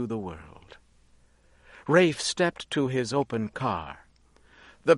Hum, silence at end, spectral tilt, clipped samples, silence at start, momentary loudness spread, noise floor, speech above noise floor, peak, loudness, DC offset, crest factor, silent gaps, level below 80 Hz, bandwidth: none; 0 s; -5 dB/octave; under 0.1%; 0 s; 20 LU; -60 dBFS; 33 dB; -6 dBFS; -27 LUFS; under 0.1%; 22 dB; none; -58 dBFS; 11.5 kHz